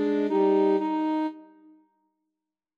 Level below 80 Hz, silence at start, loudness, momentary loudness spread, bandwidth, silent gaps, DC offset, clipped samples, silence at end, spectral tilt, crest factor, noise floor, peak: under -90 dBFS; 0 s; -25 LUFS; 8 LU; 6.6 kHz; none; under 0.1%; under 0.1%; 1.35 s; -8 dB/octave; 16 dB; -86 dBFS; -12 dBFS